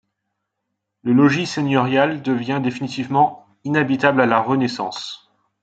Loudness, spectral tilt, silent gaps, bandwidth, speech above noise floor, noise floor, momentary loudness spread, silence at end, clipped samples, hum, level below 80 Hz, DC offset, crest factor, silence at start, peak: -19 LUFS; -6 dB/octave; none; 8 kHz; 60 dB; -78 dBFS; 13 LU; 0.45 s; under 0.1%; none; -64 dBFS; under 0.1%; 18 dB; 1.05 s; -2 dBFS